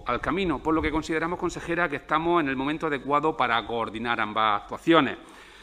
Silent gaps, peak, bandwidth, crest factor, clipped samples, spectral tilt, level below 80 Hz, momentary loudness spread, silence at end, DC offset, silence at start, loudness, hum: none; -2 dBFS; 10.5 kHz; 24 dB; under 0.1%; -5.5 dB/octave; -46 dBFS; 7 LU; 0 s; under 0.1%; 0 s; -25 LUFS; none